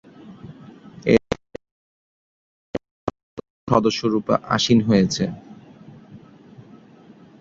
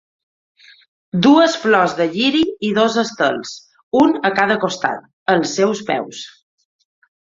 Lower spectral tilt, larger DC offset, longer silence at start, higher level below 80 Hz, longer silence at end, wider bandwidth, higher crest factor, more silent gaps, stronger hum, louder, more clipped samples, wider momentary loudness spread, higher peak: about the same, -5.5 dB/octave vs -4.5 dB/octave; neither; second, 0.25 s vs 1.15 s; first, -52 dBFS vs -58 dBFS; second, 0.8 s vs 1 s; about the same, 7.8 kHz vs 7.8 kHz; first, 22 dB vs 16 dB; first, 1.71-2.74 s, 2.91-3.07 s, 3.23-3.37 s, 3.50-3.67 s vs 3.83-3.91 s, 5.13-5.26 s; neither; second, -21 LUFS vs -16 LUFS; neither; first, 24 LU vs 13 LU; about the same, -2 dBFS vs 0 dBFS